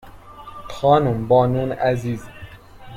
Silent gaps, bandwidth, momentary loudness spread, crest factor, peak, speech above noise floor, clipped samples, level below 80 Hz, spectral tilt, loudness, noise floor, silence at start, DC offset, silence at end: none; 15 kHz; 23 LU; 18 dB; -4 dBFS; 22 dB; under 0.1%; -46 dBFS; -7.5 dB/octave; -19 LUFS; -40 dBFS; 0.05 s; under 0.1%; 0 s